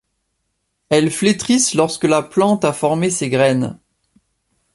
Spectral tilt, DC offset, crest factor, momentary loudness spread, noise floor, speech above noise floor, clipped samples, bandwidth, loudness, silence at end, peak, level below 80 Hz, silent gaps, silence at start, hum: -4.5 dB/octave; under 0.1%; 16 dB; 3 LU; -71 dBFS; 55 dB; under 0.1%; 11.5 kHz; -16 LUFS; 1 s; -2 dBFS; -56 dBFS; none; 0.9 s; none